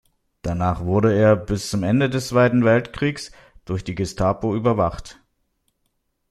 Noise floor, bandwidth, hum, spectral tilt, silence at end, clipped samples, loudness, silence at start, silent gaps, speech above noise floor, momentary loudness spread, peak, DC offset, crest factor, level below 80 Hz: -72 dBFS; 13.5 kHz; none; -6.5 dB/octave; 1.2 s; under 0.1%; -20 LUFS; 0.45 s; none; 52 dB; 13 LU; -2 dBFS; under 0.1%; 18 dB; -44 dBFS